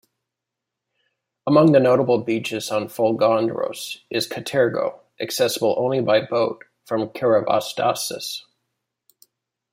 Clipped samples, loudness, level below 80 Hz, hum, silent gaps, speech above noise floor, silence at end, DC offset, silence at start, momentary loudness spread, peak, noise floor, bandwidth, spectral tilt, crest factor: under 0.1%; -21 LUFS; -68 dBFS; none; none; 64 dB; 1.35 s; under 0.1%; 1.45 s; 12 LU; -4 dBFS; -84 dBFS; 16 kHz; -5 dB/octave; 18 dB